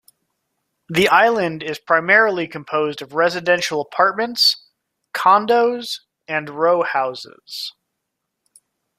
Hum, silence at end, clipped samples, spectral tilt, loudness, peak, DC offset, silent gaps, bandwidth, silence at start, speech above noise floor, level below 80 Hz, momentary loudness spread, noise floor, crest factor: none; 1.3 s; under 0.1%; -3.5 dB/octave; -17 LUFS; 0 dBFS; under 0.1%; none; 15.5 kHz; 0.9 s; 60 dB; -62 dBFS; 15 LU; -78 dBFS; 18 dB